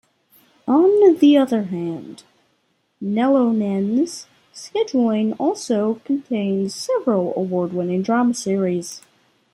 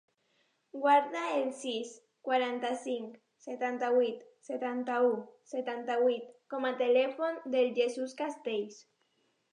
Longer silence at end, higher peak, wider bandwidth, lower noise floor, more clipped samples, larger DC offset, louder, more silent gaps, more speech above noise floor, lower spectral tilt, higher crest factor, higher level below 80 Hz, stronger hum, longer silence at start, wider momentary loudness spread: second, 0.55 s vs 0.7 s; first, -2 dBFS vs -14 dBFS; first, 14.5 kHz vs 10 kHz; second, -66 dBFS vs -75 dBFS; neither; neither; first, -19 LUFS vs -32 LUFS; neither; first, 48 dB vs 44 dB; first, -6 dB/octave vs -3.5 dB/octave; about the same, 16 dB vs 18 dB; first, -68 dBFS vs under -90 dBFS; neither; about the same, 0.65 s vs 0.75 s; about the same, 15 LU vs 14 LU